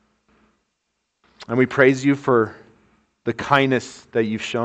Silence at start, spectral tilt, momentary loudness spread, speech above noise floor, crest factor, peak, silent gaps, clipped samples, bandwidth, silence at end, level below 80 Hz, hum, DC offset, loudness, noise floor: 1.4 s; -6 dB/octave; 11 LU; 56 dB; 22 dB; 0 dBFS; none; under 0.1%; 8.6 kHz; 0 s; -60 dBFS; none; under 0.1%; -20 LUFS; -75 dBFS